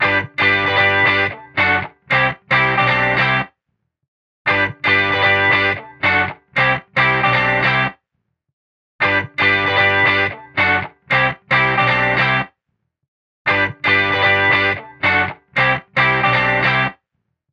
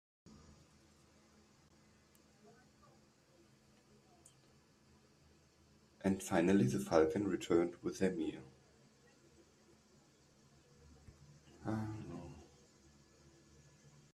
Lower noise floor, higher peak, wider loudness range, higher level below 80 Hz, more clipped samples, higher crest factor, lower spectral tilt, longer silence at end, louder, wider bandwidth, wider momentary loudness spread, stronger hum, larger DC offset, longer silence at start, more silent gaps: first, -73 dBFS vs -68 dBFS; first, -4 dBFS vs -16 dBFS; second, 2 LU vs 14 LU; first, -48 dBFS vs -70 dBFS; neither; second, 14 dB vs 26 dB; about the same, -6 dB/octave vs -6.5 dB/octave; second, 0.6 s vs 1.7 s; first, -15 LUFS vs -37 LUFS; second, 8.4 kHz vs 13.5 kHz; second, 6 LU vs 29 LU; neither; neither; second, 0 s vs 6 s; first, 4.08-4.45 s, 8.53-8.99 s, 13.08-13.45 s vs none